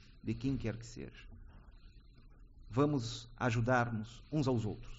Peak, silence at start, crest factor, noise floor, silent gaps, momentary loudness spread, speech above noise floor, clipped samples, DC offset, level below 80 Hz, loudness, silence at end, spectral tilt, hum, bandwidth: -18 dBFS; 0.05 s; 20 dB; -58 dBFS; none; 18 LU; 22 dB; under 0.1%; under 0.1%; -54 dBFS; -36 LUFS; 0 s; -6 dB/octave; none; 8 kHz